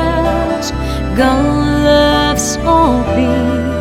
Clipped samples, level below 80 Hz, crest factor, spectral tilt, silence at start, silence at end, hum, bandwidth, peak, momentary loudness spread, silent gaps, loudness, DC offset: under 0.1%; -24 dBFS; 12 dB; -5 dB/octave; 0 s; 0 s; none; 16.5 kHz; 0 dBFS; 7 LU; none; -13 LUFS; under 0.1%